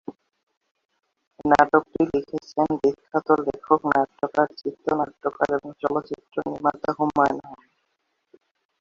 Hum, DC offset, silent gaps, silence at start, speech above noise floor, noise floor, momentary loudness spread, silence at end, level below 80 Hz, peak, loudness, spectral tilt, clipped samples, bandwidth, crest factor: none; under 0.1%; 0.43-0.47 s, 0.57-0.61 s, 0.71-0.75 s, 0.85-0.89 s, 1.27-1.31 s; 0.1 s; 51 dB; -74 dBFS; 10 LU; 1.25 s; -60 dBFS; -2 dBFS; -23 LUFS; -7 dB/octave; under 0.1%; 7.6 kHz; 22 dB